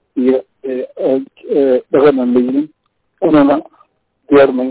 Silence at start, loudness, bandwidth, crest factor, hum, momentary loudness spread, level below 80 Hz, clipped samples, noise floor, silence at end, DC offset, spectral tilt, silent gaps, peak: 0.15 s; -13 LUFS; 4 kHz; 12 dB; none; 10 LU; -52 dBFS; under 0.1%; -54 dBFS; 0 s; under 0.1%; -10.5 dB/octave; none; -2 dBFS